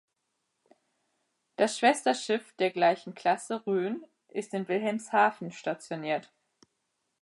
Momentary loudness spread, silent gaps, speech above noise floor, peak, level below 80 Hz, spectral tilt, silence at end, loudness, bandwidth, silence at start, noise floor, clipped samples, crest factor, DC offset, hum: 11 LU; none; 52 dB; -12 dBFS; -86 dBFS; -4 dB/octave; 1 s; -29 LUFS; 11.5 kHz; 1.6 s; -81 dBFS; under 0.1%; 20 dB; under 0.1%; none